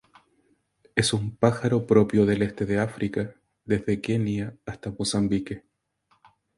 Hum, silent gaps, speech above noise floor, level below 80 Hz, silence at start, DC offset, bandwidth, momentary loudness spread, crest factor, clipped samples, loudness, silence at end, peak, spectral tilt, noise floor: none; none; 44 dB; -52 dBFS; 0.95 s; under 0.1%; 11.5 kHz; 15 LU; 22 dB; under 0.1%; -25 LUFS; 1 s; -4 dBFS; -6 dB/octave; -68 dBFS